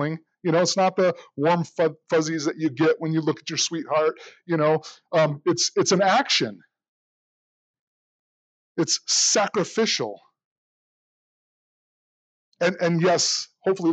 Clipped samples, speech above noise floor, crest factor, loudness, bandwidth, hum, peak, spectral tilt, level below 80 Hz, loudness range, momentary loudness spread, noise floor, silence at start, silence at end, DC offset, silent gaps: under 0.1%; over 68 dB; 16 dB; -22 LUFS; 9.4 kHz; none; -8 dBFS; -3.5 dB/octave; -82 dBFS; 4 LU; 7 LU; under -90 dBFS; 0 s; 0 s; under 0.1%; 6.88-8.75 s, 10.45-12.52 s